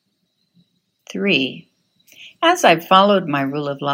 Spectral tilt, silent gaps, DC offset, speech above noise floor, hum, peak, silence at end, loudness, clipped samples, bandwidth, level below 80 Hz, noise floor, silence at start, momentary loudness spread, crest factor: -4.5 dB/octave; none; under 0.1%; 52 dB; none; 0 dBFS; 0 s; -16 LUFS; under 0.1%; 16.5 kHz; -78 dBFS; -69 dBFS; 1.1 s; 11 LU; 20 dB